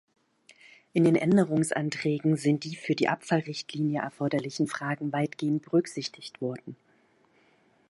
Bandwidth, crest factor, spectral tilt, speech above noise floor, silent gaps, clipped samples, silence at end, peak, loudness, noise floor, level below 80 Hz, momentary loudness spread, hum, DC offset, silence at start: 11.5 kHz; 20 dB; -6 dB/octave; 37 dB; none; under 0.1%; 1.15 s; -8 dBFS; -28 LUFS; -65 dBFS; -74 dBFS; 12 LU; none; under 0.1%; 0.95 s